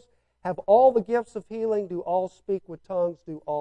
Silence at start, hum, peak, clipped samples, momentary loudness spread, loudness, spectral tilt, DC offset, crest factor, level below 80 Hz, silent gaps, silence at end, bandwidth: 0.45 s; none; -8 dBFS; under 0.1%; 15 LU; -25 LUFS; -8 dB/octave; under 0.1%; 18 dB; -64 dBFS; none; 0 s; 9.2 kHz